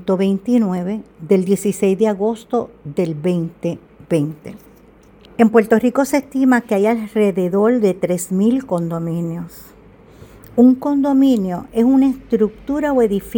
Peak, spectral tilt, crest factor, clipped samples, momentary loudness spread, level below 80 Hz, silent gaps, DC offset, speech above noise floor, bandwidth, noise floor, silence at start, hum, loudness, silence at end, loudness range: 0 dBFS; -7 dB/octave; 16 dB; under 0.1%; 12 LU; -50 dBFS; none; under 0.1%; 30 dB; 19 kHz; -46 dBFS; 0 s; none; -17 LUFS; 0 s; 4 LU